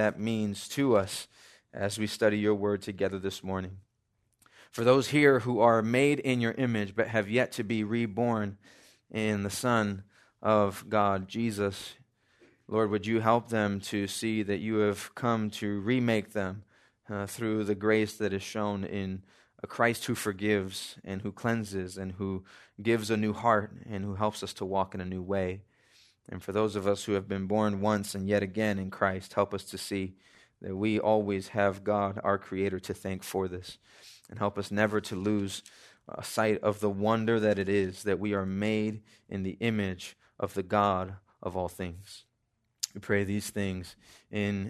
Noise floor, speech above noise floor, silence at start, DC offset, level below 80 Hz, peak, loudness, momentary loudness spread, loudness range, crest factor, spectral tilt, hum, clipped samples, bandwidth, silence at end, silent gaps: -77 dBFS; 48 dB; 0 s; under 0.1%; -68 dBFS; -8 dBFS; -30 LUFS; 13 LU; 6 LU; 22 dB; -5.5 dB/octave; none; under 0.1%; 13.5 kHz; 0 s; none